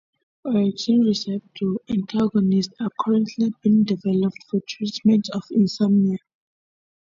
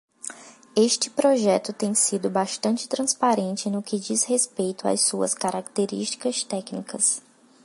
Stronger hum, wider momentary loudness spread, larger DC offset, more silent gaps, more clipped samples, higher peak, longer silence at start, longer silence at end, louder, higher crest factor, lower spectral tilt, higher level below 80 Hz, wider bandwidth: neither; about the same, 9 LU vs 7 LU; neither; neither; neither; about the same, -8 dBFS vs -6 dBFS; first, 0.45 s vs 0.25 s; first, 0.85 s vs 0.45 s; about the same, -22 LUFS vs -23 LUFS; about the same, 14 dB vs 18 dB; first, -7 dB/octave vs -3 dB/octave; first, -60 dBFS vs -74 dBFS; second, 7.4 kHz vs 11.5 kHz